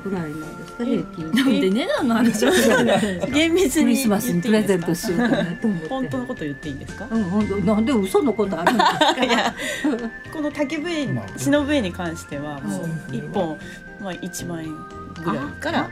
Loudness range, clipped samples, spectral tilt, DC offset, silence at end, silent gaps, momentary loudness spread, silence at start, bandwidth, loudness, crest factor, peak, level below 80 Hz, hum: 9 LU; under 0.1%; -5 dB/octave; under 0.1%; 0 s; none; 13 LU; 0 s; 16 kHz; -21 LUFS; 20 dB; -2 dBFS; -48 dBFS; none